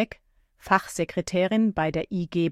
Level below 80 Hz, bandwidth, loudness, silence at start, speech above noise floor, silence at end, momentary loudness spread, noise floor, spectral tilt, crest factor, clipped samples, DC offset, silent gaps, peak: -52 dBFS; 15 kHz; -25 LUFS; 0 s; 35 dB; 0 s; 6 LU; -60 dBFS; -5.5 dB/octave; 20 dB; under 0.1%; under 0.1%; none; -6 dBFS